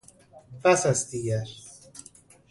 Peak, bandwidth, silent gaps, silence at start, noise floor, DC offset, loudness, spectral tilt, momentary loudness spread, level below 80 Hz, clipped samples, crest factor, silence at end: -10 dBFS; 11.5 kHz; none; 0.35 s; -53 dBFS; under 0.1%; -25 LUFS; -4.5 dB/octave; 23 LU; -60 dBFS; under 0.1%; 20 dB; 0.5 s